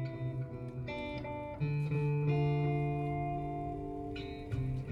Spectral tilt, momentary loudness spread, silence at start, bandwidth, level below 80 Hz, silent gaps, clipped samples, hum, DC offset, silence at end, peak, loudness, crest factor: -9.5 dB/octave; 10 LU; 0 s; 5.6 kHz; -52 dBFS; none; under 0.1%; none; under 0.1%; 0 s; -22 dBFS; -36 LUFS; 14 dB